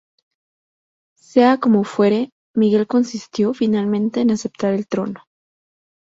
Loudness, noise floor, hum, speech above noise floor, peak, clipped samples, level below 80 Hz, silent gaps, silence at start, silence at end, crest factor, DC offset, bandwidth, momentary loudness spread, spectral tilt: -18 LUFS; under -90 dBFS; none; over 73 dB; -2 dBFS; under 0.1%; -62 dBFS; 2.32-2.54 s; 1.35 s; 0.85 s; 18 dB; under 0.1%; 7.8 kHz; 9 LU; -6.5 dB/octave